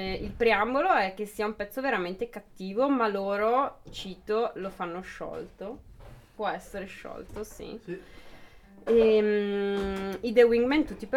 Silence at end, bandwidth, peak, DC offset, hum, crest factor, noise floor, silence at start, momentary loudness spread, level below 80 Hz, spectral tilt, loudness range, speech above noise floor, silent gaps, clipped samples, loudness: 0 s; 15.5 kHz; -8 dBFS; under 0.1%; none; 20 dB; -51 dBFS; 0 s; 18 LU; -52 dBFS; -5.5 dB/octave; 12 LU; 23 dB; none; under 0.1%; -27 LUFS